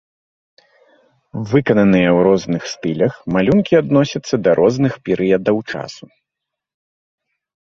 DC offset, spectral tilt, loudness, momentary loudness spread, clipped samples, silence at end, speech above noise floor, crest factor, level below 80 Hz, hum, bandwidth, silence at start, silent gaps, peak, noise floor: under 0.1%; -7 dB/octave; -16 LUFS; 11 LU; under 0.1%; 1.8 s; 67 dB; 16 dB; -50 dBFS; none; 7.6 kHz; 1.35 s; none; 0 dBFS; -82 dBFS